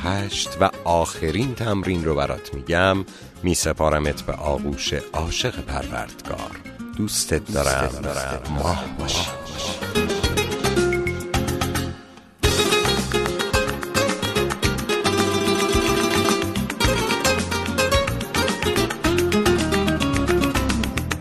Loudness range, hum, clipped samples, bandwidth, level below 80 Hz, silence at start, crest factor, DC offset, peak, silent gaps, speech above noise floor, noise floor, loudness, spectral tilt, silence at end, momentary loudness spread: 4 LU; none; under 0.1%; 13.5 kHz; -34 dBFS; 0 s; 20 dB; under 0.1%; -2 dBFS; none; 20 dB; -43 dBFS; -22 LUFS; -4 dB/octave; 0 s; 8 LU